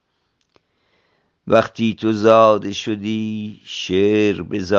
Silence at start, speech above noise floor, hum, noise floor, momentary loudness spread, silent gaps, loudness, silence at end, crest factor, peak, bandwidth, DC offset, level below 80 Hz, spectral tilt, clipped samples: 1.45 s; 52 dB; none; -69 dBFS; 14 LU; none; -17 LUFS; 0 s; 18 dB; 0 dBFS; 7.4 kHz; under 0.1%; -60 dBFS; -6 dB/octave; under 0.1%